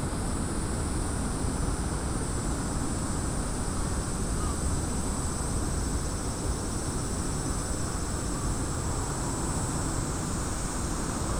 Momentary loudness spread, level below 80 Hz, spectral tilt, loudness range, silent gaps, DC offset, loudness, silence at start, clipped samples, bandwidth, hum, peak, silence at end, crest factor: 1 LU; -34 dBFS; -4.5 dB/octave; 0 LU; none; under 0.1%; -31 LUFS; 0 s; under 0.1%; 17 kHz; none; -16 dBFS; 0 s; 14 dB